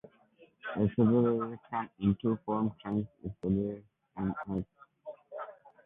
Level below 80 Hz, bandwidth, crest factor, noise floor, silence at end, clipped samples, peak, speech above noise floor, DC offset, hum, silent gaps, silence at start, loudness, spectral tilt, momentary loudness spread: -58 dBFS; 3.8 kHz; 18 dB; -63 dBFS; 0.3 s; under 0.1%; -16 dBFS; 32 dB; under 0.1%; none; none; 0.65 s; -32 LUFS; -11 dB/octave; 20 LU